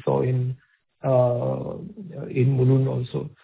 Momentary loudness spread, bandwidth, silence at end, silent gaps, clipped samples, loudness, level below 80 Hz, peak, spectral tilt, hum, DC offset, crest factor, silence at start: 16 LU; 4 kHz; 0.15 s; none; under 0.1%; -23 LUFS; -56 dBFS; -8 dBFS; -13 dB/octave; none; under 0.1%; 16 dB; 0.05 s